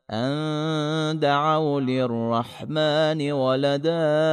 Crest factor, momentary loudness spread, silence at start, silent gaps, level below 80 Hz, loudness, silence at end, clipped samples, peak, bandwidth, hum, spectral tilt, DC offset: 14 dB; 5 LU; 0.1 s; none; -70 dBFS; -23 LUFS; 0 s; under 0.1%; -10 dBFS; 10.5 kHz; none; -6.5 dB/octave; under 0.1%